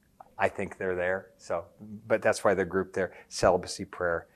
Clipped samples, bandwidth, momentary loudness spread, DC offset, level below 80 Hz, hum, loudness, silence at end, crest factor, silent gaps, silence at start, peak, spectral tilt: under 0.1%; 13 kHz; 10 LU; under 0.1%; -56 dBFS; none; -30 LUFS; 0.1 s; 22 dB; none; 0.4 s; -8 dBFS; -4.5 dB/octave